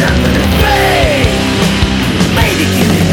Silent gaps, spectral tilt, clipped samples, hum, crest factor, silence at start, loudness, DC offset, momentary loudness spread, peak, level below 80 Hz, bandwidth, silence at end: none; -5 dB/octave; under 0.1%; none; 10 dB; 0 s; -10 LUFS; under 0.1%; 2 LU; 0 dBFS; -20 dBFS; 18 kHz; 0 s